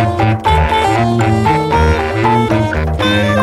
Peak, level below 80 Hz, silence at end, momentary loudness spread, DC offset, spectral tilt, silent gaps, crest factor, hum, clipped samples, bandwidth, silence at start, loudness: 0 dBFS; -22 dBFS; 0 s; 2 LU; under 0.1%; -6.5 dB/octave; none; 12 dB; none; under 0.1%; 13.5 kHz; 0 s; -13 LUFS